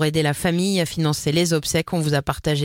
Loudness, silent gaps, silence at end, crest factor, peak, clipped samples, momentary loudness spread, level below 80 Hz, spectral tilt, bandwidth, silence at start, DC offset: -21 LUFS; none; 0 s; 18 dB; -4 dBFS; under 0.1%; 2 LU; -44 dBFS; -5 dB/octave; 17 kHz; 0 s; under 0.1%